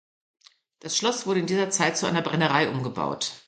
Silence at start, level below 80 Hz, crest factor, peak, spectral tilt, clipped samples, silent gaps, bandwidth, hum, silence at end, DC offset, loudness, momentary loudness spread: 0.85 s; -66 dBFS; 20 dB; -6 dBFS; -3.5 dB/octave; under 0.1%; none; 9.4 kHz; none; 0.1 s; under 0.1%; -25 LUFS; 6 LU